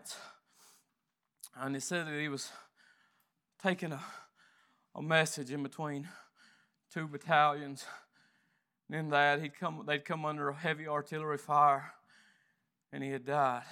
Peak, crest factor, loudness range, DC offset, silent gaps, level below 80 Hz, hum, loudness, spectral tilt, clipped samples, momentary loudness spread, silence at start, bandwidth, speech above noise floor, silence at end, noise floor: -12 dBFS; 24 dB; 7 LU; under 0.1%; none; under -90 dBFS; none; -34 LUFS; -4.5 dB/octave; under 0.1%; 21 LU; 0.05 s; 17.5 kHz; 51 dB; 0 s; -85 dBFS